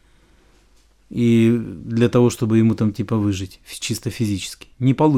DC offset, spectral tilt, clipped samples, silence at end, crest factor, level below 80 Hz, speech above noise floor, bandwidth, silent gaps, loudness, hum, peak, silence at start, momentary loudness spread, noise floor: under 0.1%; -6.5 dB/octave; under 0.1%; 0 s; 16 dB; -50 dBFS; 36 dB; 15 kHz; none; -19 LUFS; none; -4 dBFS; 1.1 s; 12 LU; -54 dBFS